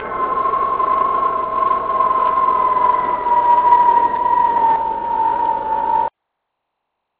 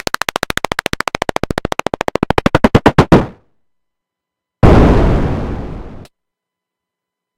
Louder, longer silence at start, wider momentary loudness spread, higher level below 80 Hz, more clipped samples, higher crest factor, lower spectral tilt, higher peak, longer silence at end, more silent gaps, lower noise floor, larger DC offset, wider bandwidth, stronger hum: about the same, -16 LUFS vs -14 LUFS; second, 0 s vs 0.7 s; second, 7 LU vs 13 LU; second, -48 dBFS vs -22 dBFS; second, under 0.1% vs 0.6%; about the same, 16 dB vs 14 dB; first, -8.5 dB/octave vs -6.5 dB/octave; about the same, -2 dBFS vs 0 dBFS; second, 1.1 s vs 1.35 s; neither; second, -76 dBFS vs -82 dBFS; neither; second, 4 kHz vs 17.5 kHz; neither